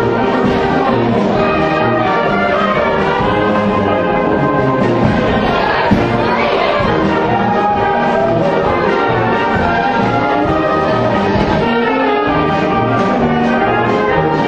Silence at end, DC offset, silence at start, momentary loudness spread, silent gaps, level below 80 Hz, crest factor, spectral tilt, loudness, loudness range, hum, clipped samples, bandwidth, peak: 0 s; under 0.1%; 0 s; 1 LU; none; -34 dBFS; 12 dB; -7.5 dB/octave; -13 LUFS; 0 LU; none; under 0.1%; 8.6 kHz; 0 dBFS